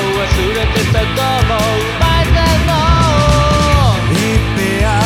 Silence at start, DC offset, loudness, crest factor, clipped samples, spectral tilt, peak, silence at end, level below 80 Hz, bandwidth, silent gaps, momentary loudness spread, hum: 0 s; under 0.1%; -12 LUFS; 12 dB; under 0.1%; -5 dB/octave; 0 dBFS; 0 s; -18 dBFS; 16.5 kHz; none; 3 LU; none